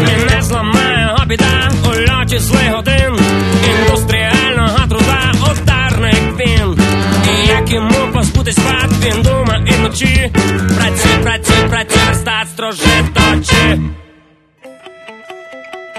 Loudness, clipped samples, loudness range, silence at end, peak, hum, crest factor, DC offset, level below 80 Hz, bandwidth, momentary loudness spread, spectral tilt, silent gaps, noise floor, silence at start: -11 LUFS; under 0.1%; 1 LU; 0 s; 0 dBFS; none; 12 dB; under 0.1%; -20 dBFS; 13.5 kHz; 3 LU; -4.5 dB/octave; none; -47 dBFS; 0 s